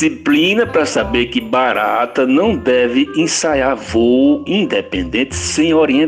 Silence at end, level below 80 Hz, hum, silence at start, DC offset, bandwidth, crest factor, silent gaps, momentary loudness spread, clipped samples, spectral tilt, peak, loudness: 0 s; -38 dBFS; none; 0 s; under 0.1%; 12.5 kHz; 12 dB; none; 5 LU; under 0.1%; -4 dB/octave; -2 dBFS; -14 LUFS